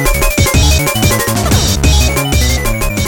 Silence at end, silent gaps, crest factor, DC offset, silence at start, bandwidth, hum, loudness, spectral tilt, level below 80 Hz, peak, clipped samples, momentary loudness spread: 0 s; none; 10 dB; under 0.1%; 0 s; 17.5 kHz; none; -11 LUFS; -4 dB/octave; -14 dBFS; 0 dBFS; under 0.1%; 3 LU